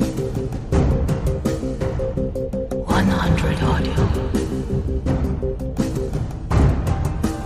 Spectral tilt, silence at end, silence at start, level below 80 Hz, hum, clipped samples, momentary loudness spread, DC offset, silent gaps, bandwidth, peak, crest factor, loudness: -7 dB/octave; 0 s; 0 s; -26 dBFS; none; under 0.1%; 7 LU; under 0.1%; none; 15 kHz; -4 dBFS; 16 dB; -22 LUFS